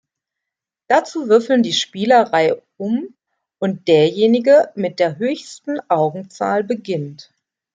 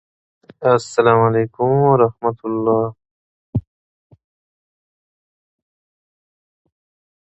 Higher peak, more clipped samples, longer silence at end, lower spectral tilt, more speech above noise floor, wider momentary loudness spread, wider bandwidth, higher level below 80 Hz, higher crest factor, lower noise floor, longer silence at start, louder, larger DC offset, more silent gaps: about the same, -2 dBFS vs 0 dBFS; neither; second, 0.5 s vs 3.65 s; second, -5 dB/octave vs -7.5 dB/octave; second, 67 dB vs over 74 dB; about the same, 12 LU vs 13 LU; first, 9.2 kHz vs 8.2 kHz; second, -68 dBFS vs -50 dBFS; about the same, 16 dB vs 20 dB; second, -84 dBFS vs under -90 dBFS; first, 0.9 s vs 0.6 s; about the same, -17 LUFS vs -17 LUFS; neither; second, none vs 3.11-3.53 s